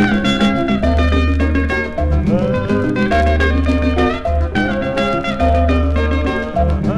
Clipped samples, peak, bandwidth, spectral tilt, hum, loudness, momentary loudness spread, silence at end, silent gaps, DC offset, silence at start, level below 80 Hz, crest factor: under 0.1%; 0 dBFS; 8.8 kHz; -7 dB/octave; none; -16 LUFS; 3 LU; 0 s; none; under 0.1%; 0 s; -20 dBFS; 14 dB